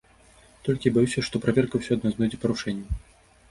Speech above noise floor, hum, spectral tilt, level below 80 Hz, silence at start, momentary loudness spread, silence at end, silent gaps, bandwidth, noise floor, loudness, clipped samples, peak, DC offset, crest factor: 31 dB; none; -6.5 dB/octave; -44 dBFS; 0.65 s; 11 LU; 0.55 s; none; 11.5 kHz; -55 dBFS; -26 LUFS; under 0.1%; -6 dBFS; under 0.1%; 20 dB